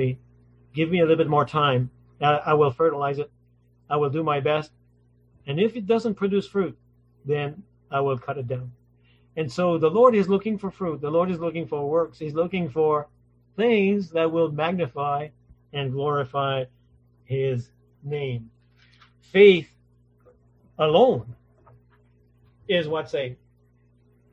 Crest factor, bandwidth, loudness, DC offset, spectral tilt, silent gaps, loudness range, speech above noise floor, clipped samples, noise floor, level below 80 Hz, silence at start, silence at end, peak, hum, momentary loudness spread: 20 dB; 8 kHz; -23 LUFS; under 0.1%; -7.5 dB/octave; none; 7 LU; 38 dB; under 0.1%; -60 dBFS; -60 dBFS; 0 s; 1 s; -4 dBFS; 60 Hz at -50 dBFS; 15 LU